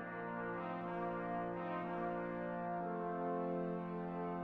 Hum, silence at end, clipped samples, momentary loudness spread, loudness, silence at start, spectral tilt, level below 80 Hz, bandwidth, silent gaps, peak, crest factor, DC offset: none; 0 s; under 0.1%; 3 LU; -42 LUFS; 0 s; -9.5 dB/octave; -68 dBFS; 4.7 kHz; none; -28 dBFS; 14 dB; under 0.1%